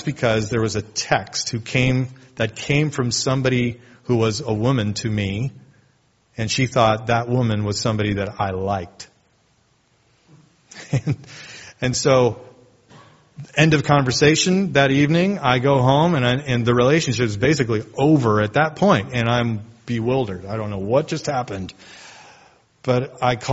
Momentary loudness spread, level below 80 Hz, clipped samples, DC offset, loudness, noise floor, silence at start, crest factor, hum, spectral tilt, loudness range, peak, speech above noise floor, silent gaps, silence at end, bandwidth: 12 LU; -48 dBFS; under 0.1%; under 0.1%; -20 LUFS; -61 dBFS; 0 s; 20 dB; none; -5 dB/octave; 8 LU; 0 dBFS; 42 dB; none; 0 s; 8 kHz